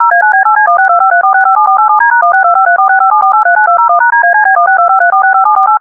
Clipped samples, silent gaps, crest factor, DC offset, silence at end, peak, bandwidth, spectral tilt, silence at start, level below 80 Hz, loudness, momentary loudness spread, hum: 0.4%; none; 6 dB; under 0.1%; 0 s; 0 dBFS; 2.6 kHz; -2.5 dB/octave; 0 s; -64 dBFS; -6 LUFS; 0 LU; none